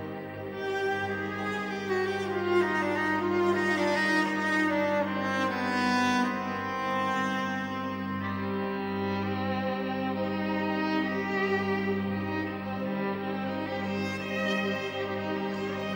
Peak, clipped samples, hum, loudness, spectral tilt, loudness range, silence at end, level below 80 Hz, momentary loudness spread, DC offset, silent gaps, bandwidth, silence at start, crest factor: -14 dBFS; under 0.1%; 50 Hz at -65 dBFS; -29 LUFS; -5.5 dB/octave; 5 LU; 0 s; -68 dBFS; 7 LU; under 0.1%; none; 16 kHz; 0 s; 14 dB